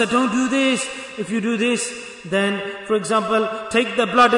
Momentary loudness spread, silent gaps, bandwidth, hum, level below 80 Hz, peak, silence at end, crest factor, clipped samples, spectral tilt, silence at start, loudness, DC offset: 9 LU; none; 11 kHz; none; -58 dBFS; -4 dBFS; 0 s; 16 dB; under 0.1%; -3.5 dB/octave; 0 s; -20 LUFS; under 0.1%